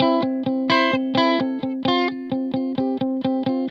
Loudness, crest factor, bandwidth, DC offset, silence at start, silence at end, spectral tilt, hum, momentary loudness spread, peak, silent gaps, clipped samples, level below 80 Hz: -21 LUFS; 18 dB; 6.8 kHz; under 0.1%; 0 s; 0 s; -6 dB/octave; none; 6 LU; -4 dBFS; none; under 0.1%; -66 dBFS